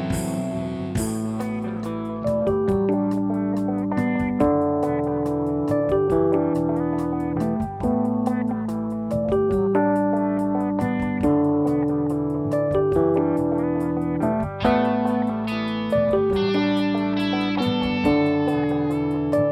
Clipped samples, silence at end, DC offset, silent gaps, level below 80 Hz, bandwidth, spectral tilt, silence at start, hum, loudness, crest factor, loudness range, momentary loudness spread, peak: under 0.1%; 0 s; under 0.1%; none; -46 dBFS; 14 kHz; -7.5 dB/octave; 0 s; none; -22 LUFS; 18 dB; 2 LU; 6 LU; -4 dBFS